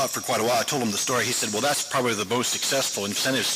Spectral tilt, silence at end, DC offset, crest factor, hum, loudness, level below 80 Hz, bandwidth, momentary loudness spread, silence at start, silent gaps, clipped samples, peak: -2 dB/octave; 0 s; under 0.1%; 10 dB; none; -23 LUFS; -68 dBFS; 16 kHz; 2 LU; 0 s; none; under 0.1%; -14 dBFS